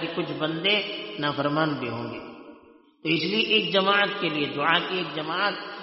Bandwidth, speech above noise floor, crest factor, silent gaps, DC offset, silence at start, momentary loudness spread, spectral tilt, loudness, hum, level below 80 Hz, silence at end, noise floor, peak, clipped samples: 6 kHz; 28 dB; 20 dB; none; under 0.1%; 0 s; 11 LU; -1.5 dB/octave; -24 LUFS; none; -70 dBFS; 0 s; -54 dBFS; -6 dBFS; under 0.1%